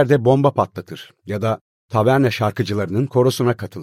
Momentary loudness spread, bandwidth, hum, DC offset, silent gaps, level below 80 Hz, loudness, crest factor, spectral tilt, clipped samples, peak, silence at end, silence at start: 13 LU; 15.5 kHz; none; under 0.1%; 1.61-1.89 s; -56 dBFS; -19 LUFS; 16 dB; -7 dB/octave; under 0.1%; -2 dBFS; 0 s; 0 s